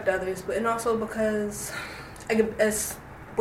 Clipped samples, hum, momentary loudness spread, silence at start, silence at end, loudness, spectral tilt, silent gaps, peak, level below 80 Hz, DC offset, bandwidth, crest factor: under 0.1%; none; 11 LU; 0 s; 0 s; -27 LUFS; -4 dB/octave; none; -10 dBFS; -50 dBFS; under 0.1%; 16 kHz; 18 dB